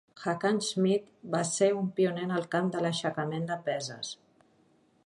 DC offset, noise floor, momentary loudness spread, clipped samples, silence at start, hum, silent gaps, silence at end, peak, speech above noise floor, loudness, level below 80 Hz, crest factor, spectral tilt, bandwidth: under 0.1%; -66 dBFS; 8 LU; under 0.1%; 0.15 s; none; none; 0.9 s; -12 dBFS; 36 dB; -30 LUFS; -76 dBFS; 18 dB; -5 dB/octave; 11.5 kHz